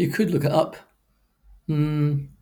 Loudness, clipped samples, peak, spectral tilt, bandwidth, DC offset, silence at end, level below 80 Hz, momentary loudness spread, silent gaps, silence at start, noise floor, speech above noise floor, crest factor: -23 LUFS; under 0.1%; -6 dBFS; -7.5 dB/octave; over 20 kHz; under 0.1%; 0.15 s; -52 dBFS; 8 LU; none; 0 s; -66 dBFS; 44 dB; 18 dB